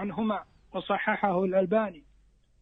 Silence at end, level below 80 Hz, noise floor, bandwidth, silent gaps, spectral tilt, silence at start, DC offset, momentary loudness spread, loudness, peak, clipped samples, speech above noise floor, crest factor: 0.6 s; -62 dBFS; -62 dBFS; 4.1 kHz; none; -9 dB/octave; 0 s; under 0.1%; 11 LU; -29 LUFS; -12 dBFS; under 0.1%; 34 dB; 18 dB